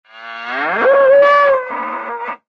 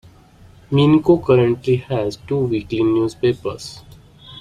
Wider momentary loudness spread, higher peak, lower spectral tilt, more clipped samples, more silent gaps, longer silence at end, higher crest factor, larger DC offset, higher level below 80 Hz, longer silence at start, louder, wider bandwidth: first, 15 LU vs 11 LU; about the same, -2 dBFS vs -2 dBFS; second, -4.5 dB/octave vs -7.5 dB/octave; neither; neither; first, 0.15 s vs 0 s; about the same, 12 dB vs 16 dB; neither; second, -62 dBFS vs -48 dBFS; second, 0.15 s vs 0.7 s; first, -13 LUFS vs -18 LUFS; second, 6 kHz vs 11 kHz